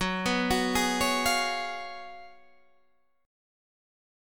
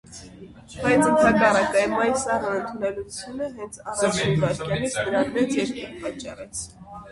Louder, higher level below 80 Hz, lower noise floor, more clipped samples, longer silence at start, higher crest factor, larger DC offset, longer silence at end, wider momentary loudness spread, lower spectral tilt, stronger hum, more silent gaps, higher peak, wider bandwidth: second, -27 LUFS vs -23 LUFS; about the same, -50 dBFS vs -50 dBFS; first, -70 dBFS vs -44 dBFS; neither; about the same, 0 s vs 0.1 s; about the same, 18 dB vs 18 dB; first, 0.3% vs under 0.1%; first, 1 s vs 0 s; about the same, 17 LU vs 17 LU; second, -3 dB/octave vs -4.5 dB/octave; neither; neither; second, -12 dBFS vs -6 dBFS; first, 19 kHz vs 11.5 kHz